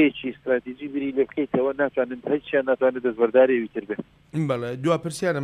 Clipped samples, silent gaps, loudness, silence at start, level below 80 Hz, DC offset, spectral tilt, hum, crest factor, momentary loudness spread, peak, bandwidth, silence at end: under 0.1%; none; -24 LUFS; 0 s; -62 dBFS; under 0.1%; -6.5 dB/octave; none; 18 dB; 12 LU; -6 dBFS; 13 kHz; 0 s